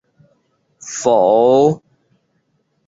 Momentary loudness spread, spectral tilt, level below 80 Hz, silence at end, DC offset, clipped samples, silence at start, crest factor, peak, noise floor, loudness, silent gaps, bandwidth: 17 LU; -5.5 dB/octave; -62 dBFS; 1.1 s; under 0.1%; under 0.1%; 0.85 s; 16 dB; -2 dBFS; -65 dBFS; -13 LUFS; none; 7.8 kHz